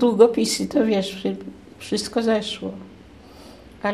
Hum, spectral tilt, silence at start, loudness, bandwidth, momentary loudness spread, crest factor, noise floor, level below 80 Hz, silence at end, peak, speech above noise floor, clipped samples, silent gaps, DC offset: none; -4.5 dB/octave; 0 s; -22 LUFS; 14.5 kHz; 19 LU; 20 dB; -45 dBFS; -54 dBFS; 0 s; -2 dBFS; 24 dB; under 0.1%; none; under 0.1%